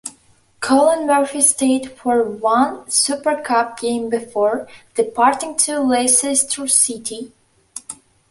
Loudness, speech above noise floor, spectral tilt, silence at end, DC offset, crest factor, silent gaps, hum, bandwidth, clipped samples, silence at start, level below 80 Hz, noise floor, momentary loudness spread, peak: -17 LUFS; 36 dB; -1.5 dB/octave; 0.35 s; under 0.1%; 18 dB; none; none; 12 kHz; under 0.1%; 0.05 s; -62 dBFS; -54 dBFS; 18 LU; 0 dBFS